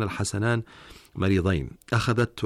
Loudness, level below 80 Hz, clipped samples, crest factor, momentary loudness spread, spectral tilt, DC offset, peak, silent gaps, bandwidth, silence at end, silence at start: -26 LUFS; -46 dBFS; under 0.1%; 14 dB; 8 LU; -6 dB/octave; under 0.1%; -12 dBFS; none; 14 kHz; 0 s; 0 s